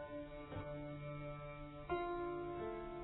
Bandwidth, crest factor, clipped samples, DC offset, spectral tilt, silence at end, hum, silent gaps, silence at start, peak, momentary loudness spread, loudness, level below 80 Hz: 3.9 kHz; 18 dB; under 0.1%; under 0.1%; -4.5 dB/octave; 0 s; none; none; 0 s; -28 dBFS; 8 LU; -46 LUFS; -58 dBFS